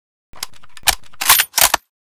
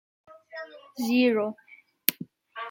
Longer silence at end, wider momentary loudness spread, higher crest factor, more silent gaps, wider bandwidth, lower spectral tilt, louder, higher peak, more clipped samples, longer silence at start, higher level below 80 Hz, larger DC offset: first, 0.3 s vs 0 s; about the same, 20 LU vs 21 LU; second, 20 dB vs 30 dB; neither; first, over 20 kHz vs 17 kHz; second, 1.5 dB/octave vs -3.5 dB/octave; first, -14 LUFS vs -26 LUFS; about the same, 0 dBFS vs 0 dBFS; first, 0.1% vs under 0.1%; about the same, 0.35 s vs 0.3 s; first, -42 dBFS vs -80 dBFS; neither